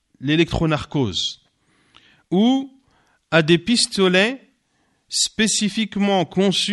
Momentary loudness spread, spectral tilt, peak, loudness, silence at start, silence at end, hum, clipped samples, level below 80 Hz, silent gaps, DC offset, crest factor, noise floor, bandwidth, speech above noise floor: 8 LU; -4 dB/octave; -2 dBFS; -19 LUFS; 0.2 s; 0 s; none; under 0.1%; -46 dBFS; none; under 0.1%; 18 dB; -66 dBFS; 11.5 kHz; 47 dB